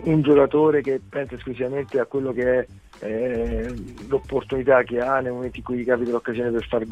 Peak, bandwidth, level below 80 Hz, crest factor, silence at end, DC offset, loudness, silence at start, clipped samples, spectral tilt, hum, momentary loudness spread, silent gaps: -4 dBFS; 9 kHz; -42 dBFS; 18 dB; 0 s; under 0.1%; -23 LUFS; 0 s; under 0.1%; -8 dB/octave; none; 13 LU; none